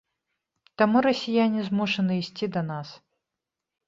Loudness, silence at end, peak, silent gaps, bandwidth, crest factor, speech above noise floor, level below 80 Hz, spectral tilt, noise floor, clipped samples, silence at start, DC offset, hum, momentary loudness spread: -25 LUFS; 0.9 s; -6 dBFS; none; 7.6 kHz; 20 dB; 62 dB; -68 dBFS; -6.5 dB/octave; -86 dBFS; under 0.1%; 0.8 s; under 0.1%; none; 11 LU